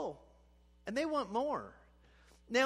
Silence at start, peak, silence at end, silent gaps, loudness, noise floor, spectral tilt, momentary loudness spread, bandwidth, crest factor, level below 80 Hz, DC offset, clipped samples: 0 s; -18 dBFS; 0 s; none; -37 LUFS; -65 dBFS; -3.5 dB/octave; 17 LU; 13 kHz; 20 dB; -66 dBFS; under 0.1%; under 0.1%